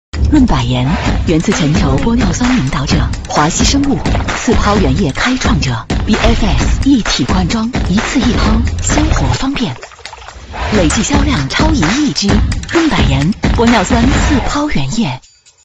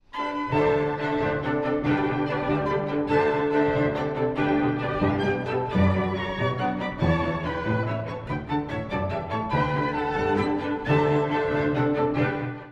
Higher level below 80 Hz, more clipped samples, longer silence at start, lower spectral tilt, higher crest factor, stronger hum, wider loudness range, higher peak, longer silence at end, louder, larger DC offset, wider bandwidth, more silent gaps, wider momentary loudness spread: first, -18 dBFS vs -46 dBFS; neither; about the same, 0.15 s vs 0.15 s; second, -5 dB/octave vs -8 dB/octave; about the same, 12 dB vs 16 dB; neither; about the same, 2 LU vs 3 LU; first, 0 dBFS vs -8 dBFS; first, 0.45 s vs 0 s; first, -12 LUFS vs -25 LUFS; neither; about the same, 8.8 kHz vs 8 kHz; neither; about the same, 5 LU vs 6 LU